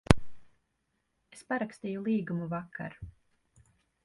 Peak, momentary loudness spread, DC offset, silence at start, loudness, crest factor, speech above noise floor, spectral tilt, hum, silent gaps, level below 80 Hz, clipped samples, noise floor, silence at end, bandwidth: 0 dBFS; 22 LU; under 0.1%; 0.1 s; -34 LUFS; 34 dB; 44 dB; -6.5 dB/octave; none; none; -46 dBFS; under 0.1%; -79 dBFS; 0.95 s; 11.5 kHz